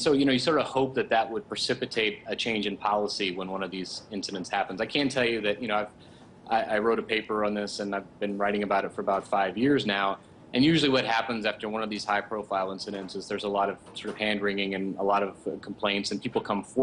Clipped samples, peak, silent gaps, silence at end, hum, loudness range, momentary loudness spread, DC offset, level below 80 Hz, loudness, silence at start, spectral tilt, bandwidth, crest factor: under 0.1%; -10 dBFS; none; 0 s; none; 4 LU; 9 LU; under 0.1%; -62 dBFS; -28 LUFS; 0 s; -4.5 dB/octave; 11 kHz; 18 dB